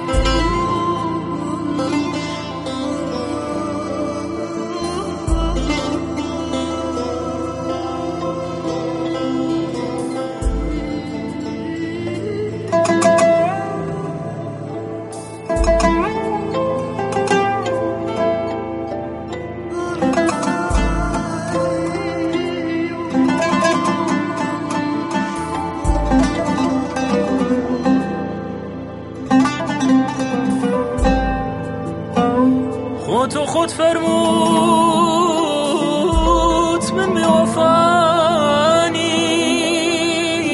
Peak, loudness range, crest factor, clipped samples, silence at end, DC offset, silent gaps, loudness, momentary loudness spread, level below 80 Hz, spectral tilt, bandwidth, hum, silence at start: -2 dBFS; 8 LU; 16 dB; under 0.1%; 0 s; under 0.1%; none; -18 LUFS; 11 LU; -30 dBFS; -5 dB/octave; 11.5 kHz; none; 0 s